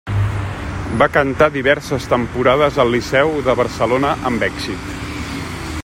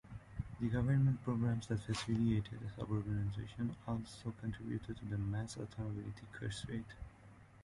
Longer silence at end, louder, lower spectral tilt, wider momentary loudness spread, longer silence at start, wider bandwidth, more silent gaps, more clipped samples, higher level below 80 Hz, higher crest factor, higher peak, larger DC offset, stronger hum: about the same, 0 s vs 0 s; first, -17 LUFS vs -40 LUFS; about the same, -6 dB/octave vs -7 dB/octave; about the same, 11 LU vs 12 LU; about the same, 0.05 s vs 0.05 s; first, 16.5 kHz vs 11.5 kHz; neither; neither; first, -34 dBFS vs -56 dBFS; about the same, 16 dB vs 16 dB; first, 0 dBFS vs -24 dBFS; neither; neither